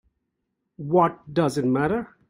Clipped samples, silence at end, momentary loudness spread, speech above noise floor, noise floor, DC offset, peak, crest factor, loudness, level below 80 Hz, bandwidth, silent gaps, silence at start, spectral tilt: under 0.1%; 0.25 s; 5 LU; 56 dB; -78 dBFS; under 0.1%; -6 dBFS; 18 dB; -23 LUFS; -58 dBFS; 16 kHz; none; 0.8 s; -7 dB/octave